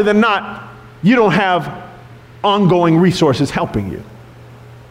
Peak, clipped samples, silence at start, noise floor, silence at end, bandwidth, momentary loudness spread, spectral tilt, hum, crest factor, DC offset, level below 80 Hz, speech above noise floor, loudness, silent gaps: -4 dBFS; under 0.1%; 0 s; -38 dBFS; 0.1 s; 14 kHz; 17 LU; -6.5 dB/octave; none; 12 dB; under 0.1%; -44 dBFS; 24 dB; -14 LUFS; none